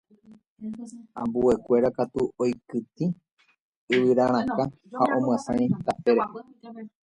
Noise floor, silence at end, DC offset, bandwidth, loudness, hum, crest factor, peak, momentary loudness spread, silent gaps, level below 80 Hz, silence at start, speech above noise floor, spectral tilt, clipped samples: -55 dBFS; 0.15 s; under 0.1%; 10.5 kHz; -25 LUFS; none; 18 dB; -8 dBFS; 18 LU; 0.47-0.56 s, 3.32-3.37 s, 3.60-3.88 s; -58 dBFS; 0.3 s; 30 dB; -7 dB/octave; under 0.1%